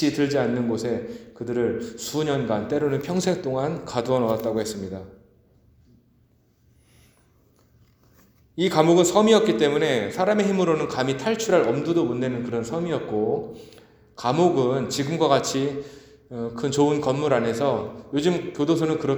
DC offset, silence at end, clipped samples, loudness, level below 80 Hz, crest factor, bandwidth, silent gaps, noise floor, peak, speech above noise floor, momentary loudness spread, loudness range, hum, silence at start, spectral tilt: under 0.1%; 0 s; under 0.1%; -23 LUFS; -58 dBFS; 22 dB; over 20 kHz; none; -61 dBFS; -2 dBFS; 39 dB; 11 LU; 8 LU; none; 0 s; -5.5 dB/octave